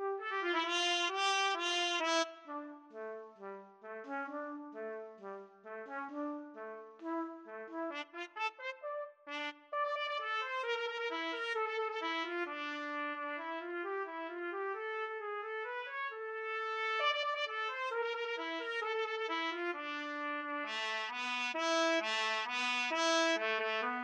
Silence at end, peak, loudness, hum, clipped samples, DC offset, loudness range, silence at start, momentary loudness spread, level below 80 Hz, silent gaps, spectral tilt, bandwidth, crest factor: 0 s; -20 dBFS; -37 LUFS; none; under 0.1%; under 0.1%; 10 LU; 0 s; 14 LU; under -90 dBFS; none; -0.5 dB/octave; 11 kHz; 18 dB